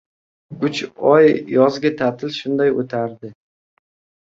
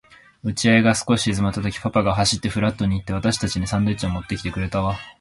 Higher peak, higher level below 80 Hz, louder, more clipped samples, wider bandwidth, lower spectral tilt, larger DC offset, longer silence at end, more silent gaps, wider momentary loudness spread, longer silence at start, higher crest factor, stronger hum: about the same, -2 dBFS vs -4 dBFS; second, -62 dBFS vs -38 dBFS; first, -18 LUFS vs -21 LUFS; neither; second, 7.8 kHz vs 11.5 kHz; first, -6.5 dB/octave vs -5 dB/octave; neither; first, 0.9 s vs 0.1 s; neither; first, 13 LU vs 9 LU; about the same, 0.5 s vs 0.45 s; about the same, 16 dB vs 18 dB; neither